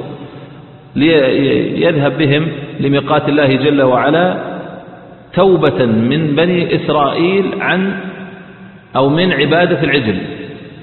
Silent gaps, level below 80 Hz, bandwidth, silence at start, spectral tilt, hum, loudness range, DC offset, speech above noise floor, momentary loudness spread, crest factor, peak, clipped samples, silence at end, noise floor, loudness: none; -48 dBFS; 4.4 kHz; 0 s; -10.5 dB/octave; none; 2 LU; under 0.1%; 24 dB; 17 LU; 14 dB; 0 dBFS; under 0.1%; 0 s; -36 dBFS; -13 LUFS